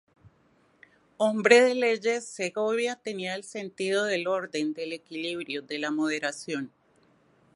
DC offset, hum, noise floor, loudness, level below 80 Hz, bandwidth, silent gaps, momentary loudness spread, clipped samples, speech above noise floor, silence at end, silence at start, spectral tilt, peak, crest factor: under 0.1%; none; -64 dBFS; -27 LUFS; -78 dBFS; 11.5 kHz; none; 16 LU; under 0.1%; 37 dB; 0.9 s; 1.2 s; -3.5 dB/octave; -2 dBFS; 26 dB